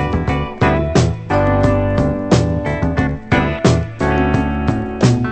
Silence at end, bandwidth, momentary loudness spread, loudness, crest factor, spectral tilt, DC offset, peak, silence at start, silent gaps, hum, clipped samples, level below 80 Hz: 0 s; 9 kHz; 4 LU; -16 LUFS; 16 dB; -7 dB/octave; under 0.1%; 0 dBFS; 0 s; none; none; under 0.1%; -26 dBFS